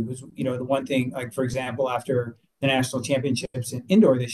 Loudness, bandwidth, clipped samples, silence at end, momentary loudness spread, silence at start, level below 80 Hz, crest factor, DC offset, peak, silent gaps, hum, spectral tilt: -25 LUFS; 12.5 kHz; under 0.1%; 0 s; 11 LU; 0 s; -56 dBFS; 16 dB; under 0.1%; -8 dBFS; none; none; -5.5 dB/octave